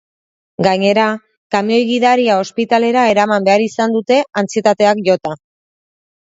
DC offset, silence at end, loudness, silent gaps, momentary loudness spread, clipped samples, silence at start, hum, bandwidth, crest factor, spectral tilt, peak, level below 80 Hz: under 0.1%; 0.95 s; -14 LUFS; 1.37-1.50 s; 6 LU; under 0.1%; 0.6 s; none; 8 kHz; 14 dB; -5 dB/octave; 0 dBFS; -60 dBFS